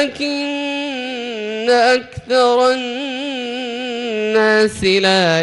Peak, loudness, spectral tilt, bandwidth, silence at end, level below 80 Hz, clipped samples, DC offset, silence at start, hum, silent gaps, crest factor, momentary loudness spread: -2 dBFS; -17 LUFS; -4 dB/octave; 12 kHz; 0 s; -52 dBFS; under 0.1%; under 0.1%; 0 s; none; none; 14 dB; 10 LU